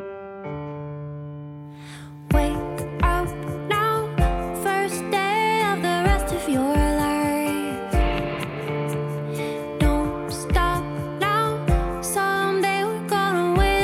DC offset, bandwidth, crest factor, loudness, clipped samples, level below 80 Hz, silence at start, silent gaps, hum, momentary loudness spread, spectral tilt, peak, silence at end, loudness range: under 0.1%; 16 kHz; 16 dB; -23 LUFS; under 0.1%; -30 dBFS; 0 s; none; none; 13 LU; -5.5 dB/octave; -8 dBFS; 0 s; 4 LU